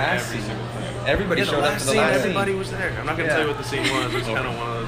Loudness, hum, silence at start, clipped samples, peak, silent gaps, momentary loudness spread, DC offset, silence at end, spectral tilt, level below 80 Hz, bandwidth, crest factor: -22 LUFS; none; 0 s; under 0.1%; -6 dBFS; none; 8 LU; under 0.1%; 0 s; -4.5 dB/octave; -42 dBFS; 15.5 kHz; 16 dB